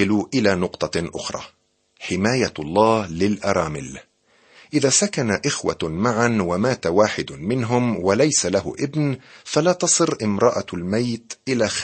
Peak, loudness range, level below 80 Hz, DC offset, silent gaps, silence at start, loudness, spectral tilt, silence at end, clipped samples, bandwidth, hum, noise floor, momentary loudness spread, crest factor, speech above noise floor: -2 dBFS; 2 LU; -52 dBFS; under 0.1%; none; 0 s; -21 LUFS; -4 dB/octave; 0 s; under 0.1%; 8.8 kHz; none; -54 dBFS; 10 LU; 20 dB; 33 dB